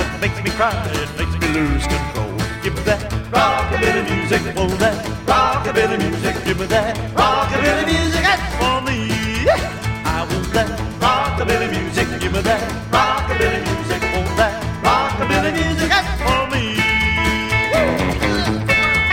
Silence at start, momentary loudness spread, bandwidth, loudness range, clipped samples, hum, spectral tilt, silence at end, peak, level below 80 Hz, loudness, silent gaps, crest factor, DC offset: 0 s; 6 LU; 16.5 kHz; 2 LU; under 0.1%; none; -5 dB/octave; 0 s; -2 dBFS; -28 dBFS; -18 LUFS; none; 16 dB; under 0.1%